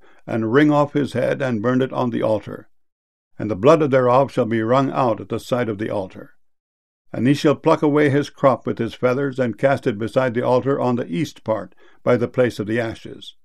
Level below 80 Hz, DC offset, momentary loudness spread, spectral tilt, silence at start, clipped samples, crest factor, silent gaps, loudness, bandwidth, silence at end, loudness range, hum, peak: -58 dBFS; 0.5%; 11 LU; -7.5 dB/octave; 0.25 s; under 0.1%; 18 dB; 2.92-3.31 s, 6.60-7.05 s; -19 LUFS; 13 kHz; 0.15 s; 3 LU; none; -2 dBFS